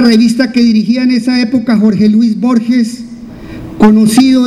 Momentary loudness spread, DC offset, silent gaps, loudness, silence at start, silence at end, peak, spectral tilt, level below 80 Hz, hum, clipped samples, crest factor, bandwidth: 19 LU; under 0.1%; none; -9 LUFS; 0 s; 0 s; 0 dBFS; -5.5 dB/octave; -40 dBFS; none; 0.7%; 8 dB; 13.5 kHz